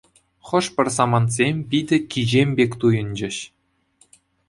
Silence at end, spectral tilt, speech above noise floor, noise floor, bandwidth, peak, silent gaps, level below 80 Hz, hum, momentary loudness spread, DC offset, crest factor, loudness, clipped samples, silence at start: 1.05 s; -5.5 dB/octave; 40 dB; -60 dBFS; 11.5 kHz; -2 dBFS; none; -54 dBFS; none; 9 LU; under 0.1%; 20 dB; -20 LUFS; under 0.1%; 0.45 s